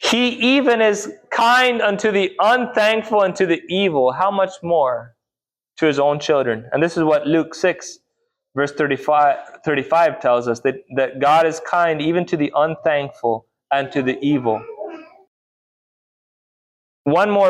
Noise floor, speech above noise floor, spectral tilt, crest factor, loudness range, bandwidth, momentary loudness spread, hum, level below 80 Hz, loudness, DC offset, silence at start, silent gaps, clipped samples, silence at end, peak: -90 dBFS; 72 dB; -4.5 dB/octave; 14 dB; 7 LU; 15 kHz; 8 LU; none; -62 dBFS; -18 LUFS; under 0.1%; 0 s; 15.27-17.05 s; under 0.1%; 0 s; -6 dBFS